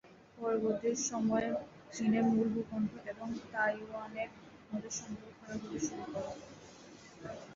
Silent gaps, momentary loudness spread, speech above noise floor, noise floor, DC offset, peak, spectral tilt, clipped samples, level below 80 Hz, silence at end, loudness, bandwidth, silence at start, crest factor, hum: none; 18 LU; 19 dB; -55 dBFS; under 0.1%; -20 dBFS; -4.5 dB/octave; under 0.1%; -68 dBFS; 0 s; -36 LUFS; 7.6 kHz; 0.05 s; 16 dB; none